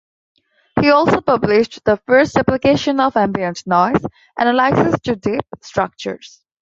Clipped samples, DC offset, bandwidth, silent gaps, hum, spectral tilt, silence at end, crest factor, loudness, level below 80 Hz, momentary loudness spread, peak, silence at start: under 0.1%; under 0.1%; 7.8 kHz; none; none; -6 dB/octave; 0.5 s; 16 dB; -16 LUFS; -46 dBFS; 11 LU; -2 dBFS; 0.75 s